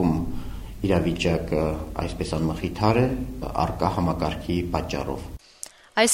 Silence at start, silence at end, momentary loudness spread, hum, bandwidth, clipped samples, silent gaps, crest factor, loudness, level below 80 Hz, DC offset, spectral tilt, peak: 0 s; 0 s; 14 LU; none; 16 kHz; under 0.1%; none; 20 dB; -26 LUFS; -36 dBFS; under 0.1%; -5 dB/octave; -4 dBFS